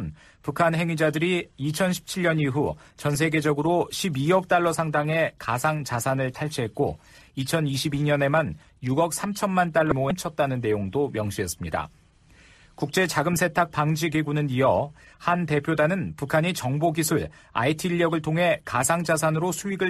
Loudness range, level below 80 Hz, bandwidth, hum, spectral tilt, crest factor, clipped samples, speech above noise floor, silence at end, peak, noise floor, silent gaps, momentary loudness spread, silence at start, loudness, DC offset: 3 LU; -52 dBFS; 14.5 kHz; none; -5 dB/octave; 20 dB; under 0.1%; 30 dB; 0 s; -6 dBFS; -55 dBFS; none; 7 LU; 0 s; -24 LUFS; under 0.1%